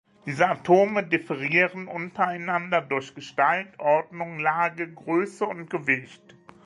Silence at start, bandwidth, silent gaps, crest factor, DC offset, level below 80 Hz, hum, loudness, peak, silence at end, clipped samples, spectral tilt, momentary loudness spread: 0.25 s; 11.5 kHz; none; 20 dB; under 0.1%; -72 dBFS; none; -25 LUFS; -4 dBFS; 0.5 s; under 0.1%; -6 dB/octave; 11 LU